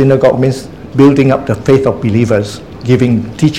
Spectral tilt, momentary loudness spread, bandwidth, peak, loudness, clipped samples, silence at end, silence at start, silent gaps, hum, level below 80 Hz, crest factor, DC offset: -7.5 dB/octave; 11 LU; 13 kHz; 0 dBFS; -11 LUFS; 0.8%; 0 s; 0 s; none; none; -38 dBFS; 10 dB; 0.8%